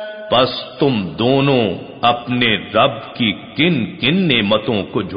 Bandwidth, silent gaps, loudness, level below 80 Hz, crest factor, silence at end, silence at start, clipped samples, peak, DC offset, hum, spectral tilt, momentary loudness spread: 5.2 kHz; none; -16 LUFS; -50 dBFS; 16 dB; 0 s; 0 s; under 0.1%; 0 dBFS; 0.1%; none; -3.5 dB/octave; 5 LU